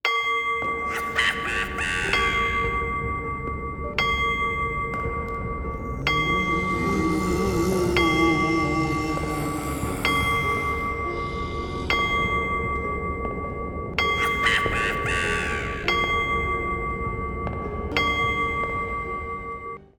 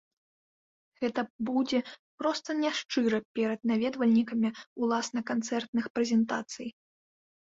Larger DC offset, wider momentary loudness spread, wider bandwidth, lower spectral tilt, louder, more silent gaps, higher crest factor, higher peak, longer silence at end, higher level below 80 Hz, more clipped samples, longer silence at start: neither; about the same, 9 LU vs 7 LU; first, over 20 kHz vs 7.8 kHz; about the same, -4.5 dB/octave vs -4.5 dB/octave; first, -24 LUFS vs -30 LUFS; second, none vs 1.30-1.39 s, 1.99-2.18 s, 2.85-2.89 s, 3.25-3.35 s, 4.67-4.76 s, 5.68-5.73 s, 5.90-5.95 s; about the same, 18 dB vs 14 dB; first, -6 dBFS vs -16 dBFS; second, 0.15 s vs 0.7 s; first, -36 dBFS vs -74 dBFS; neither; second, 0.05 s vs 1 s